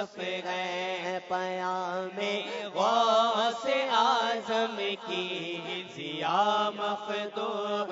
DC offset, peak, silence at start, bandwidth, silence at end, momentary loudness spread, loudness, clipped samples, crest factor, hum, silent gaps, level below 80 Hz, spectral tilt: under 0.1%; -12 dBFS; 0 s; 7.8 kHz; 0 s; 9 LU; -29 LUFS; under 0.1%; 18 dB; none; none; -82 dBFS; -3.5 dB/octave